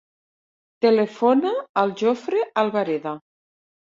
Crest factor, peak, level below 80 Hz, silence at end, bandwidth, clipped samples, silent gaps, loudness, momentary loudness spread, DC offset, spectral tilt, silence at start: 18 dB; -6 dBFS; -72 dBFS; 0.7 s; 7.4 kHz; under 0.1%; 1.69-1.75 s; -21 LUFS; 8 LU; under 0.1%; -6.5 dB/octave; 0.8 s